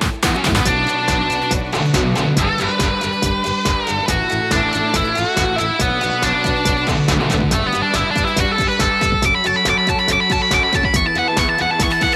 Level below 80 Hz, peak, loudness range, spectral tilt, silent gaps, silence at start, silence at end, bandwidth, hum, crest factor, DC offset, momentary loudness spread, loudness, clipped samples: -28 dBFS; -2 dBFS; 2 LU; -4 dB/octave; none; 0 s; 0 s; 15.5 kHz; none; 16 dB; under 0.1%; 3 LU; -17 LUFS; under 0.1%